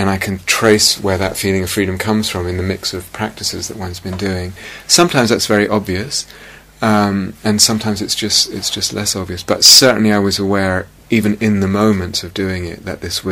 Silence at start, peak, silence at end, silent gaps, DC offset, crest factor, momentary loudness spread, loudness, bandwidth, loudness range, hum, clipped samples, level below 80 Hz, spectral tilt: 0 s; 0 dBFS; 0 s; none; under 0.1%; 16 dB; 12 LU; -14 LUFS; over 20 kHz; 7 LU; none; 0.2%; -42 dBFS; -3 dB/octave